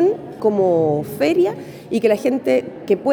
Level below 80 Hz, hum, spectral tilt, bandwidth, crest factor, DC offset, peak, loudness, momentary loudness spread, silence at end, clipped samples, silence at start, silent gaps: -60 dBFS; none; -7 dB/octave; over 20 kHz; 14 dB; under 0.1%; -2 dBFS; -19 LUFS; 5 LU; 0 s; under 0.1%; 0 s; none